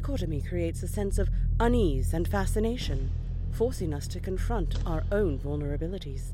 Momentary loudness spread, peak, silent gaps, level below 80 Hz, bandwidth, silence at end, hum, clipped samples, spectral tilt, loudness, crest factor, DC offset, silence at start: 8 LU; -12 dBFS; none; -32 dBFS; 15 kHz; 0 s; none; under 0.1%; -6.5 dB/octave; -30 LUFS; 16 dB; under 0.1%; 0 s